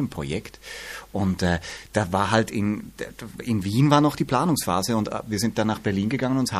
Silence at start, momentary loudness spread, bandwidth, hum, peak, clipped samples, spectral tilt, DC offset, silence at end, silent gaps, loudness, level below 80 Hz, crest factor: 0 s; 15 LU; 15 kHz; none; -4 dBFS; under 0.1%; -5.5 dB/octave; under 0.1%; 0 s; none; -24 LUFS; -48 dBFS; 20 dB